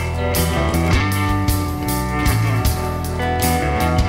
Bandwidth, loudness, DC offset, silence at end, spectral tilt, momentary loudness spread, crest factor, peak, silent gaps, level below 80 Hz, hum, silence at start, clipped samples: 16.5 kHz; -19 LUFS; under 0.1%; 0 s; -5.5 dB/octave; 4 LU; 12 dB; -6 dBFS; none; -24 dBFS; none; 0 s; under 0.1%